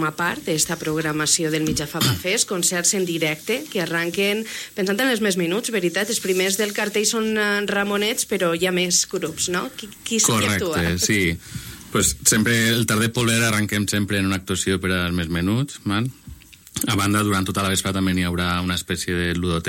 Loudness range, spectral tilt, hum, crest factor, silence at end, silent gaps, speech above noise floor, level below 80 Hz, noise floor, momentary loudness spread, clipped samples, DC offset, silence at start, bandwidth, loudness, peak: 3 LU; -3.5 dB/octave; none; 20 dB; 0 s; none; 21 dB; -46 dBFS; -42 dBFS; 6 LU; under 0.1%; under 0.1%; 0 s; 16.5 kHz; -21 LUFS; -2 dBFS